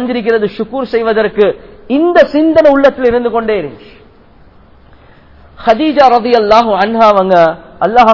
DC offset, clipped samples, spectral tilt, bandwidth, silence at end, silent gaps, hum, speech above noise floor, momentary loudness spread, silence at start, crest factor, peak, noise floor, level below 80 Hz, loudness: 0.4%; 2%; -6.5 dB/octave; 6 kHz; 0 s; none; none; 32 dB; 9 LU; 0 s; 10 dB; 0 dBFS; -42 dBFS; -40 dBFS; -10 LUFS